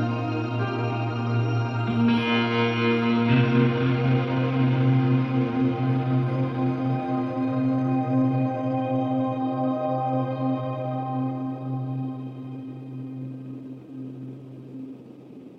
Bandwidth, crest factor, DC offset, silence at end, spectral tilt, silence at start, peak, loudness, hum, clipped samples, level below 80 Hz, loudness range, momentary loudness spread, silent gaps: 6 kHz; 16 dB; under 0.1%; 0 s; -9 dB/octave; 0 s; -8 dBFS; -24 LUFS; none; under 0.1%; -62 dBFS; 11 LU; 17 LU; none